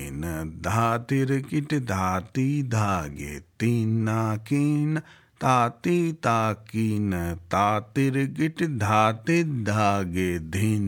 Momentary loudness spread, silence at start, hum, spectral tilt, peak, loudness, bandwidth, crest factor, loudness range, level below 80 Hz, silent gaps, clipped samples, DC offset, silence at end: 6 LU; 0 s; none; -6.5 dB/octave; -6 dBFS; -25 LUFS; 18 kHz; 18 dB; 2 LU; -54 dBFS; none; under 0.1%; under 0.1%; 0 s